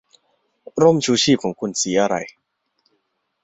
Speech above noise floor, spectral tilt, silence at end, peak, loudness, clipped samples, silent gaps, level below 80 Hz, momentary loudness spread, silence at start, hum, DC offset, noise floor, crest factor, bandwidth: 53 dB; -4 dB/octave; 1.15 s; -2 dBFS; -18 LUFS; under 0.1%; none; -60 dBFS; 12 LU; 0.75 s; none; under 0.1%; -71 dBFS; 18 dB; 8.2 kHz